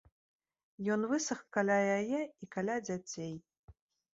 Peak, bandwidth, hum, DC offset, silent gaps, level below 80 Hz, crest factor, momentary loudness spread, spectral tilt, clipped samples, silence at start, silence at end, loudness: -16 dBFS; 7.6 kHz; none; under 0.1%; 3.58-3.68 s; -72 dBFS; 20 dB; 12 LU; -5 dB/octave; under 0.1%; 0.8 s; 0.45 s; -35 LUFS